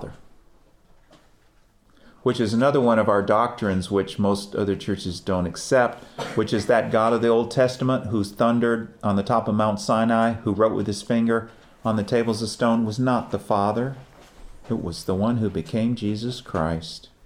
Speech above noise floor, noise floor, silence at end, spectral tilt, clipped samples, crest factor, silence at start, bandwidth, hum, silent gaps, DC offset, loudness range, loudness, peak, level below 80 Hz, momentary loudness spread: 35 dB; -57 dBFS; 0.25 s; -6.5 dB/octave; under 0.1%; 18 dB; 0 s; 15 kHz; none; none; under 0.1%; 4 LU; -23 LUFS; -6 dBFS; -52 dBFS; 9 LU